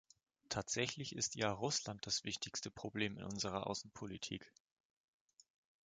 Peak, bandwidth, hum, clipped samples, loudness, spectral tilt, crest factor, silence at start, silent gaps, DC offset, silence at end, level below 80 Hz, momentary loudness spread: -22 dBFS; 10 kHz; none; under 0.1%; -42 LUFS; -3 dB/octave; 24 dB; 0.5 s; none; under 0.1%; 1.35 s; -70 dBFS; 8 LU